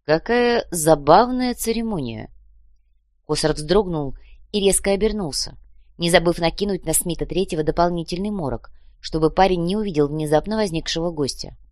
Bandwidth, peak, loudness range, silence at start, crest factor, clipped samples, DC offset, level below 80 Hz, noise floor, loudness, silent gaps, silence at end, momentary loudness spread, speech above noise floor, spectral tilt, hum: 13.5 kHz; 0 dBFS; 3 LU; 0.1 s; 20 dB; under 0.1%; 0.3%; -36 dBFS; -61 dBFS; -20 LUFS; none; 0.15 s; 11 LU; 40 dB; -4.5 dB/octave; none